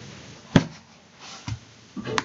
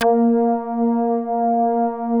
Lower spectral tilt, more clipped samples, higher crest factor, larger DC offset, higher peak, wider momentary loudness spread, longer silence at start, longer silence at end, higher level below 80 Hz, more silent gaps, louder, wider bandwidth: about the same, -5.5 dB/octave vs -6.5 dB/octave; neither; first, 28 dB vs 12 dB; neither; first, 0 dBFS vs -6 dBFS; first, 21 LU vs 4 LU; about the same, 0 s vs 0 s; about the same, 0 s vs 0 s; first, -50 dBFS vs -64 dBFS; neither; second, -27 LUFS vs -19 LUFS; first, 8.8 kHz vs 5.4 kHz